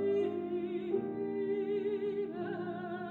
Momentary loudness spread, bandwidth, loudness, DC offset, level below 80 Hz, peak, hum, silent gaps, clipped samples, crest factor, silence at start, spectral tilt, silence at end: 5 LU; 4.3 kHz; -36 LUFS; under 0.1%; -76 dBFS; -20 dBFS; none; none; under 0.1%; 14 dB; 0 s; -9 dB/octave; 0 s